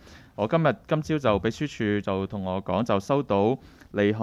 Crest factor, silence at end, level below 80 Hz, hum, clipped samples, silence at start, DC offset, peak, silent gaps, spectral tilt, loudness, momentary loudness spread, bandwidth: 18 dB; 0 s; -54 dBFS; none; under 0.1%; 0.1 s; under 0.1%; -8 dBFS; none; -7 dB/octave; -26 LUFS; 7 LU; 13 kHz